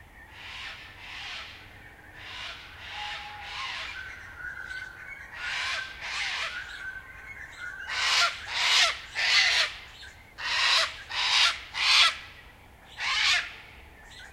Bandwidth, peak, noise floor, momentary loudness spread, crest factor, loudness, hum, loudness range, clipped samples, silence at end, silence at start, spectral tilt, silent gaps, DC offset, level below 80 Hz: 16 kHz; -8 dBFS; -51 dBFS; 21 LU; 24 dB; -25 LUFS; none; 14 LU; under 0.1%; 0 s; 0 s; 1 dB/octave; none; under 0.1%; -56 dBFS